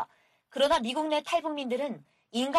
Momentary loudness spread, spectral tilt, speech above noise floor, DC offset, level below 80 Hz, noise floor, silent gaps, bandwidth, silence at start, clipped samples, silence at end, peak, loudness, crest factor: 15 LU; -3.5 dB/octave; 33 dB; under 0.1%; -62 dBFS; -62 dBFS; none; 14 kHz; 0 s; under 0.1%; 0 s; -12 dBFS; -29 LUFS; 18 dB